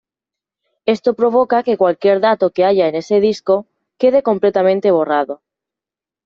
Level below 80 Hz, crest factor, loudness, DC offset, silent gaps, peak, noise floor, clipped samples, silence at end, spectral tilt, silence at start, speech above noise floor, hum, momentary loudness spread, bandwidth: -60 dBFS; 14 dB; -15 LUFS; under 0.1%; none; -2 dBFS; -88 dBFS; under 0.1%; 0.9 s; -6.5 dB/octave; 0.85 s; 74 dB; none; 5 LU; 7.4 kHz